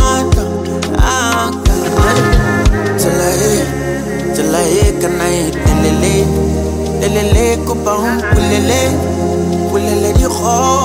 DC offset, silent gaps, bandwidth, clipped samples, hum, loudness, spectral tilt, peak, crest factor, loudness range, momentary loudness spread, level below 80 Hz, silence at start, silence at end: under 0.1%; none; 16.5 kHz; under 0.1%; none; -13 LUFS; -5 dB/octave; 0 dBFS; 12 dB; 1 LU; 4 LU; -20 dBFS; 0 s; 0 s